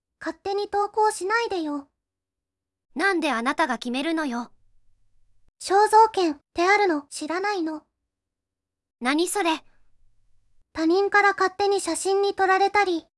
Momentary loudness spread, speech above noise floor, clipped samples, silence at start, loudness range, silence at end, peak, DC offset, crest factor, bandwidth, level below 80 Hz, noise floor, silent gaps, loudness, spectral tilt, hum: 13 LU; 65 dB; under 0.1%; 0.2 s; 5 LU; 0.2 s; -6 dBFS; under 0.1%; 18 dB; 12 kHz; -64 dBFS; -87 dBFS; none; -23 LUFS; -2 dB/octave; none